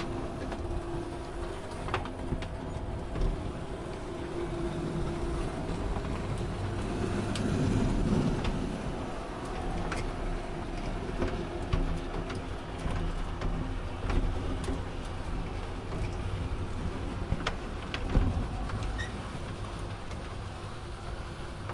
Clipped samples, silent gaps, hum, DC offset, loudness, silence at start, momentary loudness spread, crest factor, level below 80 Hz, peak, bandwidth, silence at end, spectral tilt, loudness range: under 0.1%; none; none; under 0.1%; -35 LUFS; 0 s; 8 LU; 22 dB; -38 dBFS; -10 dBFS; 11.5 kHz; 0 s; -6.5 dB/octave; 5 LU